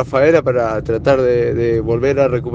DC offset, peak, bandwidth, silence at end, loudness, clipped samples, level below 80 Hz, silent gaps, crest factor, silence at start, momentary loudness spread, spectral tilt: under 0.1%; 0 dBFS; 7.4 kHz; 0 s; -15 LUFS; under 0.1%; -36 dBFS; none; 14 dB; 0 s; 5 LU; -8 dB/octave